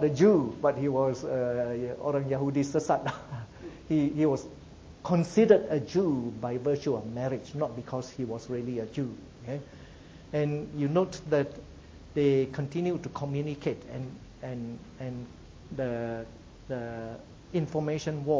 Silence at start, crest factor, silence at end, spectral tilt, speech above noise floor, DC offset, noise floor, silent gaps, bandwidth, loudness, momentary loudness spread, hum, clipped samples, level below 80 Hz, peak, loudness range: 0 s; 22 dB; 0 s; -7.5 dB/octave; 20 dB; under 0.1%; -49 dBFS; none; 8 kHz; -30 LUFS; 18 LU; none; under 0.1%; -56 dBFS; -8 dBFS; 9 LU